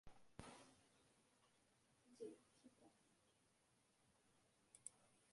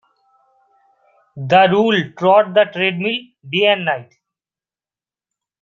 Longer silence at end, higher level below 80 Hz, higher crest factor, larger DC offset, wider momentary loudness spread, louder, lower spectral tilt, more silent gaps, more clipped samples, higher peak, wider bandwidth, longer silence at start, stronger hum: second, 0 s vs 1.6 s; second, -84 dBFS vs -64 dBFS; first, 32 dB vs 16 dB; neither; second, 7 LU vs 11 LU; second, -62 LUFS vs -15 LUFS; second, -3.5 dB/octave vs -6.5 dB/octave; neither; neither; second, -36 dBFS vs -2 dBFS; first, 11.5 kHz vs 7.2 kHz; second, 0.05 s vs 1.35 s; neither